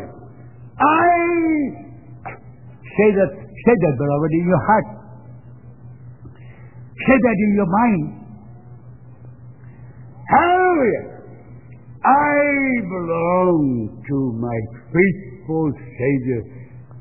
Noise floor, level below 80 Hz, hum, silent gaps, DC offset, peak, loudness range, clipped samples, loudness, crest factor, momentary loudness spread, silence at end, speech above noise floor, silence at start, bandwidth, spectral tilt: -41 dBFS; -48 dBFS; none; none; 0.4%; 0 dBFS; 3 LU; under 0.1%; -18 LUFS; 18 dB; 21 LU; 0 s; 24 dB; 0 s; 3 kHz; -11.5 dB/octave